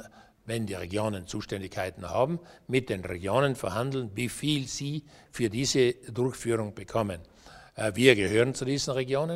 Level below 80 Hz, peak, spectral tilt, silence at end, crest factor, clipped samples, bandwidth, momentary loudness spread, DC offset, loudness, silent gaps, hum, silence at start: -56 dBFS; -4 dBFS; -5 dB/octave; 0 s; 26 dB; under 0.1%; 16 kHz; 12 LU; under 0.1%; -29 LUFS; none; none; 0 s